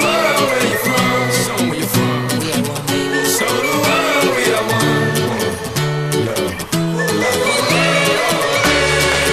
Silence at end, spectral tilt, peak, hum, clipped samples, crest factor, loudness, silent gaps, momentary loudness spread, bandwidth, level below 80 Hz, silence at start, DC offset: 0 s; -3.5 dB/octave; -2 dBFS; none; under 0.1%; 14 dB; -15 LUFS; none; 5 LU; 14 kHz; -40 dBFS; 0 s; under 0.1%